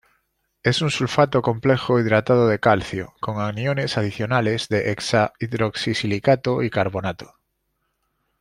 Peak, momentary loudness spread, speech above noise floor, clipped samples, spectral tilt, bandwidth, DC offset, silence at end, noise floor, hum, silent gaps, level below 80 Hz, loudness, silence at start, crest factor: -2 dBFS; 8 LU; 52 dB; under 0.1%; -6 dB/octave; 12 kHz; under 0.1%; 1.15 s; -73 dBFS; none; none; -54 dBFS; -21 LUFS; 0.65 s; 20 dB